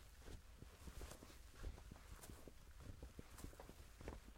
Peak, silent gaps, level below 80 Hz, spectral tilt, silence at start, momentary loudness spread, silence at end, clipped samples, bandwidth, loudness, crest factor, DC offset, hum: -36 dBFS; none; -60 dBFS; -4.5 dB/octave; 0 s; 4 LU; 0 s; under 0.1%; 16 kHz; -60 LUFS; 20 dB; under 0.1%; none